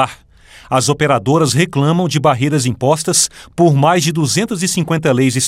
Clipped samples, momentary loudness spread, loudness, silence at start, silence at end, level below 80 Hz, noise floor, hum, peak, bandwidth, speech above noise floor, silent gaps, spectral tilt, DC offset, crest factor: under 0.1%; 4 LU; -14 LUFS; 0 s; 0 s; -48 dBFS; -42 dBFS; none; 0 dBFS; 16 kHz; 29 dB; none; -4.5 dB/octave; under 0.1%; 14 dB